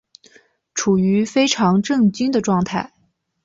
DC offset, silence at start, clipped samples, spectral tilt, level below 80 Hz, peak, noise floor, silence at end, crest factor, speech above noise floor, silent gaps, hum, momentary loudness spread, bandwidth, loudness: under 0.1%; 0.75 s; under 0.1%; -5 dB/octave; -56 dBFS; -4 dBFS; -53 dBFS; 0.6 s; 16 dB; 36 dB; none; none; 9 LU; 7.8 kHz; -18 LUFS